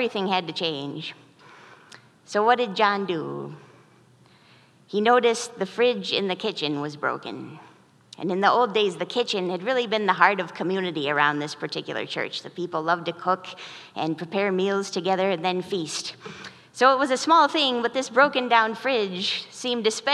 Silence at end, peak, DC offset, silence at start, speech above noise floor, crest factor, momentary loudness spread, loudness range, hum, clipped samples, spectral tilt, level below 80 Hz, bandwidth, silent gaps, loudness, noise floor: 0 s; -2 dBFS; under 0.1%; 0 s; 32 dB; 22 dB; 14 LU; 6 LU; none; under 0.1%; -4 dB/octave; -80 dBFS; 12.5 kHz; none; -24 LUFS; -56 dBFS